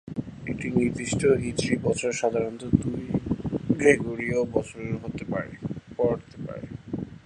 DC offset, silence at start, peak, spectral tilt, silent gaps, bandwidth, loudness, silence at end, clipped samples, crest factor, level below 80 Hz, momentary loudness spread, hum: under 0.1%; 0.05 s; -4 dBFS; -6 dB/octave; none; 11 kHz; -27 LUFS; 0.05 s; under 0.1%; 22 dB; -48 dBFS; 13 LU; none